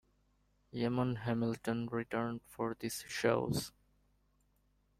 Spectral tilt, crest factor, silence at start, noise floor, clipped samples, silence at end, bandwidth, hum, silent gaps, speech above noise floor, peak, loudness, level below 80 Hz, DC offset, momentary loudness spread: -5.5 dB/octave; 20 dB; 0.75 s; -74 dBFS; under 0.1%; 1.3 s; 16 kHz; 50 Hz at -65 dBFS; none; 38 dB; -18 dBFS; -37 LUFS; -66 dBFS; under 0.1%; 8 LU